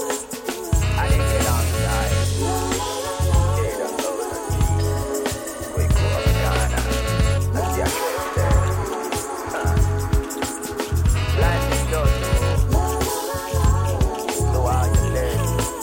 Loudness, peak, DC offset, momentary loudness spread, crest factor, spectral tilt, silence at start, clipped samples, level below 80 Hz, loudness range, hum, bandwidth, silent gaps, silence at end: -22 LUFS; -8 dBFS; under 0.1%; 6 LU; 12 dB; -5 dB/octave; 0 s; under 0.1%; -24 dBFS; 2 LU; none; 17 kHz; none; 0 s